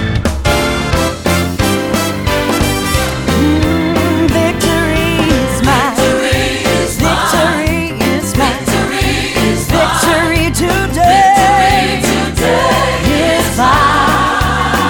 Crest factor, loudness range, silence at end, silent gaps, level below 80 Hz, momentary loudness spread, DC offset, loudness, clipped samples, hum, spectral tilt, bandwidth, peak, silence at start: 12 dB; 3 LU; 0 s; none; -24 dBFS; 5 LU; under 0.1%; -12 LUFS; under 0.1%; none; -4.5 dB/octave; over 20 kHz; 0 dBFS; 0 s